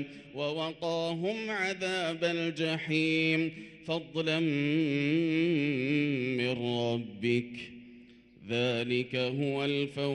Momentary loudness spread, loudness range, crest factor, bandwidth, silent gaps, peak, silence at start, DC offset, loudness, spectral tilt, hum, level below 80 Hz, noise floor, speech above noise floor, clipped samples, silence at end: 8 LU; 3 LU; 16 dB; 11 kHz; none; -16 dBFS; 0 s; under 0.1%; -31 LUFS; -6 dB/octave; none; -72 dBFS; -55 dBFS; 24 dB; under 0.1%; 0 s